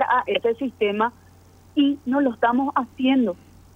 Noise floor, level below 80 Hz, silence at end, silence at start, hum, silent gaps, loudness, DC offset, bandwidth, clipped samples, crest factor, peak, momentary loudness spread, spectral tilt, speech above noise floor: -50 dBFS; -60 dBFS; 0.4 s; 0 s; none; none; -22 LUFS; under 0.1%; 6 kHz; under 0.1%; 16 dB; -8 dBFS; 6 LU; -6.5 dB/octave; 29 dB